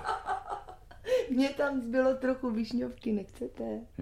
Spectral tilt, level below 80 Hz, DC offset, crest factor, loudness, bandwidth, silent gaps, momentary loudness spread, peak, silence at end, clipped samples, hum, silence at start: -6 dB/octave; -56 dBFS; under 0.1%; 16 dB; -32 LUFS; 13.5 kHz; none; 13 LU; -16 dBFS; 0 s; under 0.1%; none; 0 s